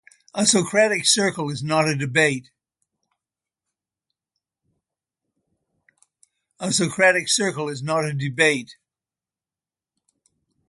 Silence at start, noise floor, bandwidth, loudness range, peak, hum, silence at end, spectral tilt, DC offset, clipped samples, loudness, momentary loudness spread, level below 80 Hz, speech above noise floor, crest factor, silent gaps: 0.35 s; under -90 dBFS; 11.5 kHz; 7 LU; -2 dBFS; none; 1.95 s; -3 dB/octave; under 0.1%; under 0.1%; -20 LUFS; 11 LU; -66 dBFS; over 69 dB; 22 dB; none